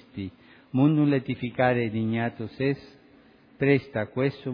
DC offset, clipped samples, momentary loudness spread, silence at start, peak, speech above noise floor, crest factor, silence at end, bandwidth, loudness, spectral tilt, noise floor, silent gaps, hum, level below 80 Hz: under 0.1%; under 0.1%; 11 LU; 0.15 s; -8 dBFS; 30 dB; 18 dB; 0 s; 5.2 kHz; -26 LUFS; -10.5 dB/octave; -56 dBFS; none; none; -62 dBFS